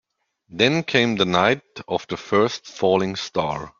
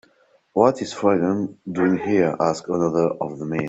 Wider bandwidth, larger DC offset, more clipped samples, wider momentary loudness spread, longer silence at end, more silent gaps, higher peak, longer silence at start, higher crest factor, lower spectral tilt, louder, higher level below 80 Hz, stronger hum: about the same, 7.6 kHz vs 8.2 kHz; neither; neither; about the same, 9 LU vs 7 LU; about the same, 0.1 s vs 0 s; neither; about the same, -2 dBFS vs -2 dBFS; about the same, 0.5 s vs 0.55 s; about the same, 20 dB vs 20 dB; second, -5 dB/octave vs -7 dB/octave; about the same, -21 LUFS vs -21 LUFS; about the same, -58 dBFS vs -60 dBFS; neither